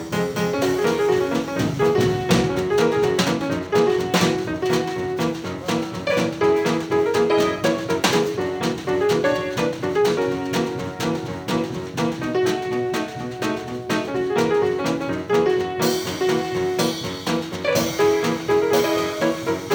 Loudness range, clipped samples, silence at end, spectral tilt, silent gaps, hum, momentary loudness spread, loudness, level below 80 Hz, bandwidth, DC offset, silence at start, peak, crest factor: 3 LU; under 0.1%; 0 s; -5 dB/octave; none; none; 6 LU; -21 LUFS; -50 dBFS; over 20 kHz; under 0.1%; 0 s; -4 dBFS; 16 dB